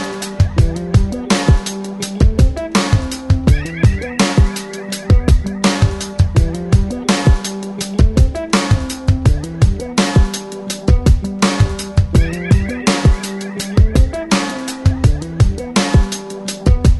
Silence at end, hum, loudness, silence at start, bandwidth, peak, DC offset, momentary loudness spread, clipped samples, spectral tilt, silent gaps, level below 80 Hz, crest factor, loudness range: 0 s; none; -16 LUFS; 0 s; 12 kHz; 0 dBFS; under 0.1%; 8 LU; under 0.1%; -5.5 dB/octave; none; -18 dBFS; 14 dB; 1 LU